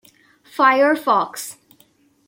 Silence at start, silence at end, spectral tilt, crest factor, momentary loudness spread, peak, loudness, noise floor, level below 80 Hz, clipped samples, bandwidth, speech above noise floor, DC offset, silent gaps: 0.55 s; 0.75 s; -3 dB/octave; 18 dB; 19 LU; -2 dBFS; -17 LUFS; -57 dBFS; -74 dBFS; under 0.1%; 16.5 kHz; 40 dB; under 0.1%; none